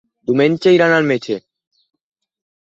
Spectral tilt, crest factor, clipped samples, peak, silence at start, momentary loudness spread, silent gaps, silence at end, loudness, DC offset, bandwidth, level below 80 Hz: -6.5 dB/octave; 16 dB; under 0.1%; -2 dBFS; 0.3 s; 12 LU; none; 1.3 s; -15 LUFS; under 0.1%; 7.8 kHz; -62 dBFS